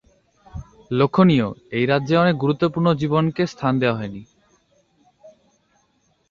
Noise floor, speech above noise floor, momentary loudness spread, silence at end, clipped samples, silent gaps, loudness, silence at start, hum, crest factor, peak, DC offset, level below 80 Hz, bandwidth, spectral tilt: -65 dBFS; 46 dB; 23 LU; 1 s; under 0.1%; none; -19 LUFS; 0.55 s; none; 18 dB; -2 dBFS; under 0.1%; -52 dBFS; 7.2 kHz; -8 dB/octave